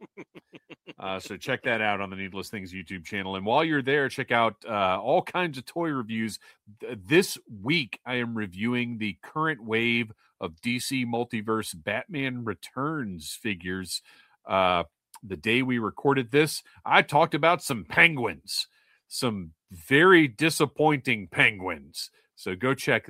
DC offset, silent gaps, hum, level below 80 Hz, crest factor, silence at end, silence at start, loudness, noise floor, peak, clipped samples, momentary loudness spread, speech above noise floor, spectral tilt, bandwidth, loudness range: under 0.1%; none; none; -64 dBFS; 26 dB; 0.1 s; 0 s; -26 LUFS; -51 dBFS; -2 dBFS; under 0.1%; 15 LU; 24 dB; -4.5 dB/octave; 16 kHz; 7 LU